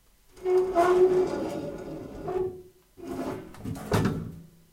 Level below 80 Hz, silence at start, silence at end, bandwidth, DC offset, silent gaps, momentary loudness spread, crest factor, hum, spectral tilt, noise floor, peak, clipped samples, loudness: -50 dBFS; 0.35 s; 0.3 s; 16 kHz; under 0.1%; none; 17 LU; 18 dB; none; -7 dB/octave; -48 dBFS; -10 dBFS; under 0.1%; -27 LUFS